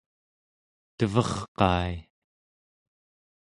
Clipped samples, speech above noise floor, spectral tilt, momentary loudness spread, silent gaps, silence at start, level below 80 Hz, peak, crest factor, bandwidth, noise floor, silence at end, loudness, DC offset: under 0.1%; over 64 dB; -6 dB/octave; 9 LU; 1.48-1.55 s; 1 s; -46 dBFS; -4 dBFS; 26 dB; 11.5 kHz; under -90 dBFS; 1.4 s; -27 LUFS; under 0.1%